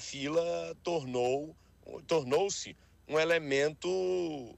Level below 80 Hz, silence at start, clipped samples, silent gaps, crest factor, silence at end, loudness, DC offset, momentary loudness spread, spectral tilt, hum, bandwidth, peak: -66 dBFS; 0 s; under 0.1%; none; 18 dB; 0.05 s; -32 LUFS; under 0.1%; 10 LU; -4 dB/octave; none; 13 kHz; -16 dBFS